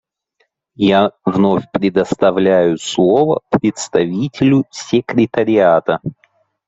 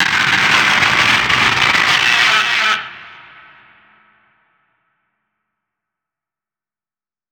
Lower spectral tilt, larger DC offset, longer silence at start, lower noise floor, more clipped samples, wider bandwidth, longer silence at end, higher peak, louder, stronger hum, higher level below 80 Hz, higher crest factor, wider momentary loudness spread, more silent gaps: first, -6 dB/octave vs -1.5 dB/octave; neither; first, 0.8 s vs 0 s; second, -64 dBFS vs under -90 dBFS; neither; second, 8.2 kHz vs 19.5 kHz; second, 0.55 s vs 4.2 s; about the same, -2 dBFS vs 0 dBFS; second, -15 LUFS vs -11 LUFS; neither; about the same, -52 dBFS vs -50 dBFS; about the same, 14 dB vs 18 dB; about the same, 5 LU vs 4 LU; neither